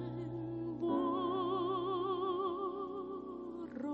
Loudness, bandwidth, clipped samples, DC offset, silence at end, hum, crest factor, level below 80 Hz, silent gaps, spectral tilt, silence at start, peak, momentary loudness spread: -38 LUFS; 4.8 kHz; under 0.1%; under 0.1%; 0 s; none; 14 dB; -68 dBFS; none; -6 dB/octave; 0 s; -24 dBFS; 9 LU